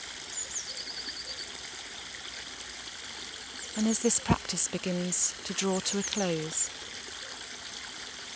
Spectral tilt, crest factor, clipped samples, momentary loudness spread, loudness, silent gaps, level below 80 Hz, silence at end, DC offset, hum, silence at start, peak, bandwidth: -3 dB/octave; 24 dB; under 0.1%; 12 LU; -32 LUFS; none; -56 dBFS; 0 s; under 0.1%; none; 0 s; -10 dBFS; 8 kHz